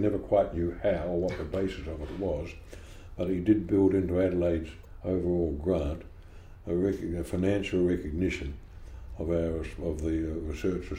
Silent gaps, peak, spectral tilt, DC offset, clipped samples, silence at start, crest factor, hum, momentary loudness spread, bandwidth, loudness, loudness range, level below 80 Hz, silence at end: none; -12 dBFS; -8 dB/octave; under 0.1%; under 0.1%; 0 s; 18 dB; none; 17 LU; 15.5 kHz; -30 LUFS; 3 LU; -42 dBFS; 0 s